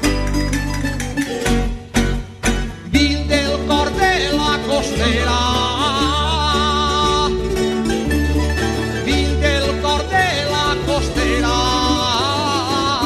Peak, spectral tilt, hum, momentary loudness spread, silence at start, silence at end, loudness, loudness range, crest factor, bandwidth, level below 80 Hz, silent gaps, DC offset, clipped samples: -2 dBFS; -4.5 dB/octave; none; 5 LU; 0 s; 0 s; -17 LUFS; 2 LU; 16 dB; 15 kHz; -24 dBFS; none; under 0.1%; under 0.1%